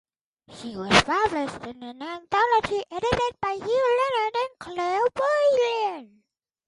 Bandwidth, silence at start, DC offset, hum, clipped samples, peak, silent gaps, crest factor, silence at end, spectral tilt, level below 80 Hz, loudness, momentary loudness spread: 11.5 kHz; 0.5 s; under 0.1%; none; under 0.1%; -4 dBFS; none; 22 dB; 0.6 s; -4 dB/octave; -50 dBFS; -24 LUFS; 17 LU